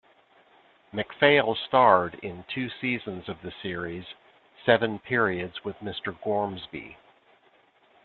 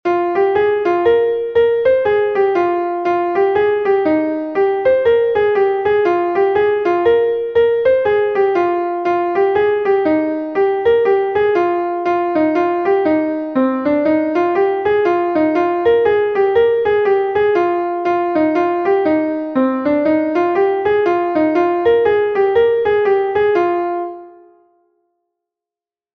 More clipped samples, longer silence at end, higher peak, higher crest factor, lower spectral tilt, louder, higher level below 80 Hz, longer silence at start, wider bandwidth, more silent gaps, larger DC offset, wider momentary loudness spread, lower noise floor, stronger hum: neither; second, 1.1 s vs 1.85 s; about the same, -4 dBFS vs -2 dBFS; first, 24 dB vs 12 dB; about the same, -8.5 dB/octave vs -7.5 dB/octave; second, -26 LUFS vs -15 LUFS; second, -64 dBFS vs -52 dBFS; first, 0.95 s vs 0.05 s; second, 4.5 kHz vs 6.2 kHz; neither; neither; first, 18 LU vs 4 LU; second, -62 dBFS vs -90 dBFS; neither